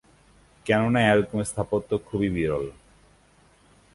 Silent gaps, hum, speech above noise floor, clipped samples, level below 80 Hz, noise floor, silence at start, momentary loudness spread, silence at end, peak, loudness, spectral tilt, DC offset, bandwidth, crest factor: none; 50 Hz at -50 dBFS; 35 dB; under 0.1%; -50 dBFS; -58 dBFS; 0.65 s; 10 LU; 1.25 s; -6 dBFS; -24 LUFS; -6 dB/octave; under 0.1%; 11.5 kHz; 20 dB